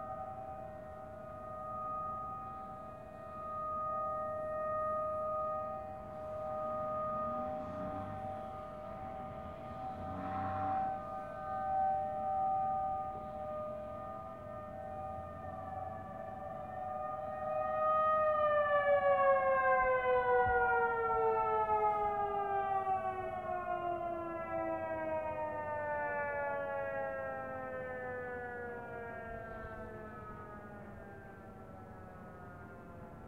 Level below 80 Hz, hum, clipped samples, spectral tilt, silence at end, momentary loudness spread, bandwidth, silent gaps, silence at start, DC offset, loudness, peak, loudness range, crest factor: -60 dBFS; none; under 0.1%; -7.5 dB/octave; 0 s; 18 LU; 11 kHz; none; 0 s; under 0.1%; -37 LUFS; -18 dBFS; 13 LU; 18 dB